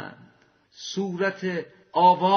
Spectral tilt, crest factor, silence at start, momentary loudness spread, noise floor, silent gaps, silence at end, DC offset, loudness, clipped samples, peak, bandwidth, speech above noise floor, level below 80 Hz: -3.5 dB/octave; 18 dB; 0 s; 17 LU; -60 dBFS; none; 0 s; under 0.1%; -25 LUFS; under 0.1%; -6 dBFS; 6.6 kHz; 38 dB; -74 dBFS